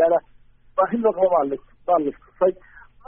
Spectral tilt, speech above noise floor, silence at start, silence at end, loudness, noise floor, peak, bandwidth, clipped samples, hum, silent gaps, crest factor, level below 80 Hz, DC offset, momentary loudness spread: -2 dB/octave; 30 dB; 0 s; 0.55 s; -22 LUFS; -51 dBFS; -6 dBFS; 3.5 kHz; under 0.1%; none; none; 16 dB; -56 dBFS; under 0.1%; 10 LU